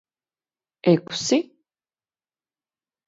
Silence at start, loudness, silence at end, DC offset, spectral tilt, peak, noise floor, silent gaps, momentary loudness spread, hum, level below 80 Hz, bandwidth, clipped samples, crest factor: 0.85 s; -22 LUFS; 1.65 s; under 0.1%; -5 dB/octave; -4 dBFS; under -90 dBFS; none; 6 LU; none; -72 dBFS; 8 kHz; under 0.1%; 22 dB